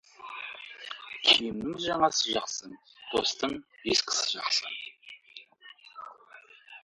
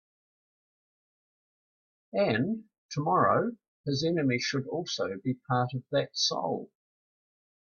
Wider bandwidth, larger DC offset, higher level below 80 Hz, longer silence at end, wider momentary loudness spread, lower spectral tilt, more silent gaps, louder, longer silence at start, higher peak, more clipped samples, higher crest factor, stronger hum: first, 11.5 kHz vs 7.2 kHz; neither; about the same, -66 dBFS vs -70 dBFS; second, 0.05 s vs 1.05 s; first, 24 LU vs 10 LU; second, -1 dB/octave vs -5 dB/octave; second, none vs 2.78-2.89 s, 3.68-3.84 s; about the same, -28 LUFS vs -30 LUFS; second, 0.2 s vs 2.15 s; first, -8 dBFS vs -12 dBFS; neither; about the same, 24 dB vs 20 dB; neither